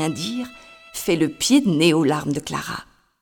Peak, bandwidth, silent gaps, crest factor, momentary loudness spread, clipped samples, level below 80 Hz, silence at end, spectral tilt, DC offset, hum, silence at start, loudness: -2 dBFS; over 20 kHz; none; 20 dB; 15 LU; under 0.1%; -54 dBFS; 0.4 s; -4.5 dB/octave; under 0.1%; none; 0 s; -20 LUFS